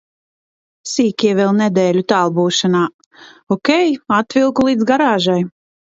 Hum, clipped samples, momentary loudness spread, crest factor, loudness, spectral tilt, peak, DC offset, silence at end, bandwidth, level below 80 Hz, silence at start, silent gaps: none; under 0.1%; 7 LU; 16 dB; -15 LUFS; -5 dB/octave; 0 dBFS; under 0.1%; 0.45 s; 8 kHz; -58 dBFS; 0.85 s; 2.94-2.99 s, 3.06-3.11 s, 3.43-3.47 s